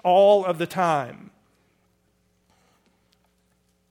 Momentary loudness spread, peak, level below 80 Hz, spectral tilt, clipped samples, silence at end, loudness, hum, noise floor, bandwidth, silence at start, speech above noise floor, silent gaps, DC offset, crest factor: 11 LU; -6 dBFS; -72 dBFS; -5.5 dB/octave; under 0.1%; 2.8 s; -20 LUFS; none; -67 dBFS; 15.5 kHz; 0.05 s; 47 dB; none; under 0.1%; 18 dB